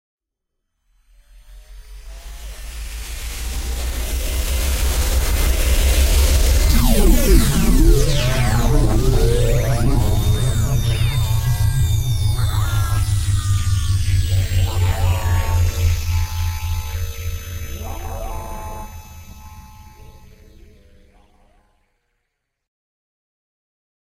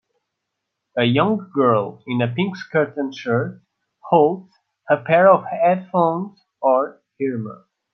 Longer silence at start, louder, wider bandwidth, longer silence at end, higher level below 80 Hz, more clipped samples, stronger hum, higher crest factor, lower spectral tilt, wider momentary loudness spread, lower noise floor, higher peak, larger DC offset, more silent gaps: first, 1.5 s vs 0.95 s; about the same, -19 LUFS vs -19 LUFS; first, 16 kHz vs 6.6 kHz; first, 3.85 s vs 0.4 s; first, -20 dBFS vs -66 dBFS; neither; neither; about the same, 16 dB vs 18 dB; second, -5 dB/octave vs -8 dB/octave; about the same, 16 LU vs 14 LU; about the same, -77 dBFS vs -79 dBFS; about the same, -2 dBFS vs -2 dBFS; neither; neither